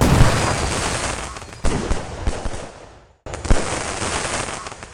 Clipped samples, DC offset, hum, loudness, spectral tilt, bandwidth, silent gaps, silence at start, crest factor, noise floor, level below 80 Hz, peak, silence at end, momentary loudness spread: under 0.1%; under 0.1%; none; -22 LUFS; -4.5 dB/octave; 16 kHz; none; 0 s; 20 dB; -44 dBFS; -26 dBFS; 0 dBFS; 0 s; 16 LU